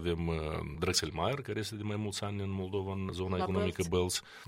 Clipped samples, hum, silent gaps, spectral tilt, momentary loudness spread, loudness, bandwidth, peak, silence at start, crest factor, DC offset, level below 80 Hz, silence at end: under 0.1%; none; none; -4.5 dB/octave; 6 LU; -34 LUFS; 16 kHz; -14 dBFS; 0 s; 20 dB; under 0.1%; -52 dBFS; 0 s